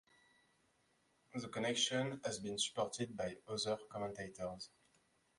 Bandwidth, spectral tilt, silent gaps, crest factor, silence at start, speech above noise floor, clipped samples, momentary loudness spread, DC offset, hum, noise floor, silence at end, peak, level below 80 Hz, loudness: 11.5 kHz; -3 dB/octave; none; 22 dB; 1.35 s; 36 dB; under 0.1%; 12 LU; under 0.1%; none; -77 dBFS; 0.7 s; -22 dBFS; -74 dBFS; -41 LUFS